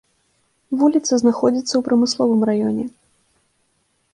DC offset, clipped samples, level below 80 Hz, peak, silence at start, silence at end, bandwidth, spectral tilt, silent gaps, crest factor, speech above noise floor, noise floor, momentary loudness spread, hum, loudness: under 0.1%; under 0.1%; -62 dBFS; -4 dBFS; 0.7 s; 1.25 s; 10.5 kHz; -5 dB/octave; none; 16 dB; 49 dB; -66 dBFS; 9 LU; none; -18 LUFS